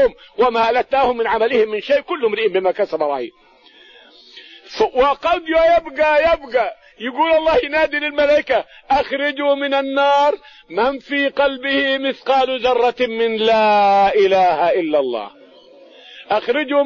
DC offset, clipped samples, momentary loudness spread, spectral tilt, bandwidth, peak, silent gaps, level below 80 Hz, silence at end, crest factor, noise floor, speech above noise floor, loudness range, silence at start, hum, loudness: under 0.1%; under 0.1%; 7 LU; -4.5 dB/octave; 7.2 kHz; -6 dBFS; none; -48 dBFS; 0 s; 12 dB; -46 dBFS; 30 dB; 4 LU; 0 s; none; -17 LUFS